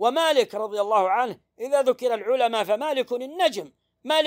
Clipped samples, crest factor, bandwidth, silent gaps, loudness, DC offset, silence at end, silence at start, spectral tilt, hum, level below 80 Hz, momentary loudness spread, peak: under 0.1%; 16 dB; 16 kHz; none; -23 LUFS; under 0.1%; 0 s; 0 s; -2.5 dB/octave; none; -80 dBFS; 9 LU; -8 dBFS